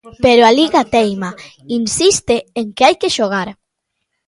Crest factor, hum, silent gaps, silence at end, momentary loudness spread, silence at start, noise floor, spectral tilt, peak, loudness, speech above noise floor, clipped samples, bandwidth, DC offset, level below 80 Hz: 14 dB; none; none; 0.75 s; 14 LU; 0.05 s; -74 dBFS; -3 dB/octave; 0 dBFS; -13 LUFS; 60 dB; under 0.1%; 11.5 kHz; under 0.1%; -46 dBFS